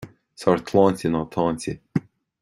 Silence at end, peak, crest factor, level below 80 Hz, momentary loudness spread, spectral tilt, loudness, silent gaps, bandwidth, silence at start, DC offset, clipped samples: 0.4 s; -4 dBFS; 20 dB; -54 dBFS; 11 LU; -7 dB/octave; -23 LUFS; none; 13 kHz; 0 s; under 0.1%; under 0.1%